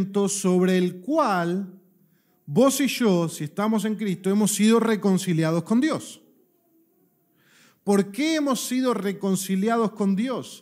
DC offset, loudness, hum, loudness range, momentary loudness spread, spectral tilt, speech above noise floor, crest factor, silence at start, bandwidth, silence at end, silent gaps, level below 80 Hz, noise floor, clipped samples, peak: under 0.1%; -23 LUFS; none; 5 LU; 7 LU; -5.5 dB/octave; 42 dB; 16 dB; 0 s; 16 kHz; 0.05 s; none; -78 dBFS; -65 dBFS; under 0.1%; -8 dBFS